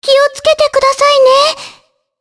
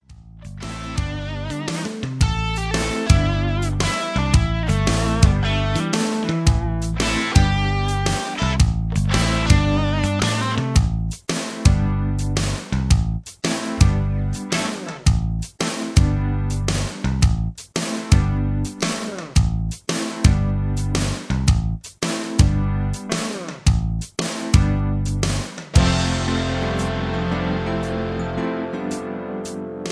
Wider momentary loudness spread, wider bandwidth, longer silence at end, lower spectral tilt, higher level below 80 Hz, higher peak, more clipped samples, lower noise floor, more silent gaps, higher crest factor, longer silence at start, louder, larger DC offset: second, 5 LU vs 9 LU; about the same, 11 kHz vs 11 kHz; first, 0.5 s vs 0 s; second, 0 dB/octave vs -5 dB/octave; second, -48 dBFS vs -26 dBFS; about the same, 0 dBFS vs -2 dBFS; neither; first, -45 dBFS vs -40 dBFS; neither; second, 10 dB vs 18 dB; about the same, 0 s vs 0.1 s; first, -9 LUFS vs -21 LUFS; neither